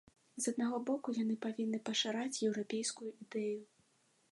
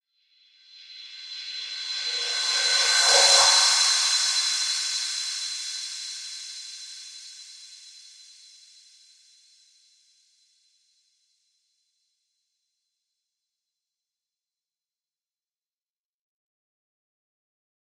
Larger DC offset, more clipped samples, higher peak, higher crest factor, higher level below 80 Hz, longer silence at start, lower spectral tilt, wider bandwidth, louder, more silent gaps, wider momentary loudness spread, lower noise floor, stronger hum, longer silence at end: neither; neither; second, -22 dBFS vs -6 dBFS; second, 16 dB vs 24 dB; second, -86 dBFS vs -80 dBFS; second, 0.35 s vs 0.75 s; first, -3.5 dB/octave vs 4.5 dB/octave; second, 11.5 kHz vs 15 kHz; second, -38 LUFS vs -21 LUFS; neither; second, 7 LU vs 26 LU; second, -74 dBFS vs under -90 dBFS; neither; second, 0.65 s vs 9.8 s